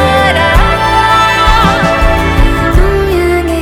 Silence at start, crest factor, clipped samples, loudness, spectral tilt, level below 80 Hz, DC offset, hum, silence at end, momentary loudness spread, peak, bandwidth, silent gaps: 0 s; 8 dB; 0.6%; -9 LUFS; -5.5 dB/octave; -14 dBFS; under 0.1%; none; 0 s; 3 LU; 0 dBFS; 17.5 kHz; none